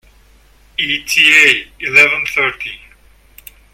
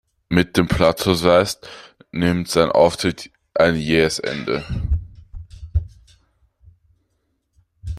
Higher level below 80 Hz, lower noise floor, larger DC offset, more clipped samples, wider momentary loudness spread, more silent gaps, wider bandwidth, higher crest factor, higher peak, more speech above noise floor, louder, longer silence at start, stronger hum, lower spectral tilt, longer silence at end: second, -48 dBFS vs -34 dBFS; second, -47 dBFS vs -69 dBFS; neither; first, 0.2% vs under 0.1%; second, 18 LU vs 23 LU; neither; first, over 20 kHz vs 15.5 kHz; about the same, 16 dB vs 20 dB; about the same, 0 dBFS vs -2 dBFS; second, 34 dB vs 52 dB; first, -10 LUFS vs -19 LUFS; first, 0.8 s vs 0.3 s; neither; second, -1 dB/octave vs -5.5 dB/octave; first, 1 s vs 0 s